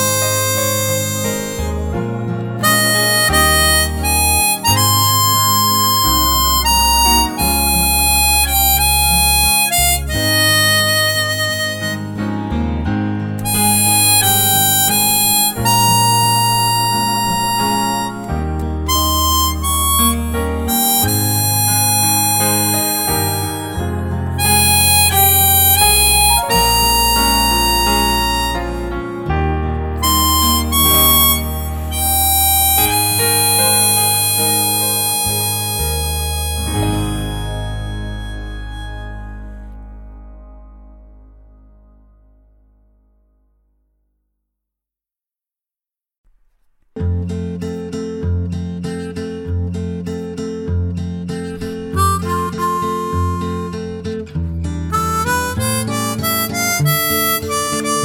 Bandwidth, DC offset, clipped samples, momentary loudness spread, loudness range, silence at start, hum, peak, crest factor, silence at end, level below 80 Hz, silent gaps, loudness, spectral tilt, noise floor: over 20 kHz; under 0.1%; under 0.1%; 14 LU; 12 LU; 0 s; none; 0 dBFS; 16 dB; 0 s; -28 dBFS; 46.18-46.24 s; -13 LUFS; -2.5 dB/octave; -89 dBFS